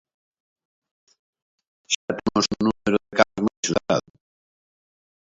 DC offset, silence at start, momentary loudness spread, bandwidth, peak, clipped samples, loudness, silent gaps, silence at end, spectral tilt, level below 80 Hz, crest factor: under 0.1%; 1.9 s; 5 LU; 7.8 kHz; 0 dBFS; under 0.1%; -23 LUFS; 1.95-2.08 s, 3.57-3.63 s; 1.4 s; -4 dB/octave; -56 dBFS; 26 dB